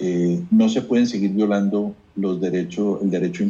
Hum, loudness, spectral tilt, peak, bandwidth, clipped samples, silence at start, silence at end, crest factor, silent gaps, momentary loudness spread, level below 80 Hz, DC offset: none; -21 LUFS; -7 dB/octave; -8 dBFS; 7.4 kHz; under 0.1%; 0 s; 0 s; 12 dB; none; 8 LU; -60 dBFS; under 0.1%